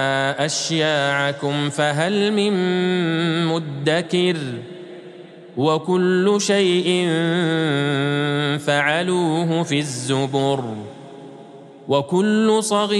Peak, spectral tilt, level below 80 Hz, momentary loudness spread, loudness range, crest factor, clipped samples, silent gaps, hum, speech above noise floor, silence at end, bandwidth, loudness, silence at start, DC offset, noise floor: -4 dBFS; -5 dB/octave; -70 dBFS; 16 LU; 3 LU; 16 dB; under 0.1%; none; none; 22 dB; 0 s; 12.5 kHz; -19 LUFS; 0 s; under 0.1%; -41 dBFS